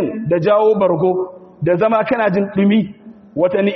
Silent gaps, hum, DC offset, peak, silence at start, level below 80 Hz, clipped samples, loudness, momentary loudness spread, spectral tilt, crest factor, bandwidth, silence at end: none; none; under 0.1%; -2 dBFS; 0 s; -56 dBFS; under 0.1%; -16 LUFS; 10 LU; -6.5 dB/octave; 12 dB; 6 kHz; 0 s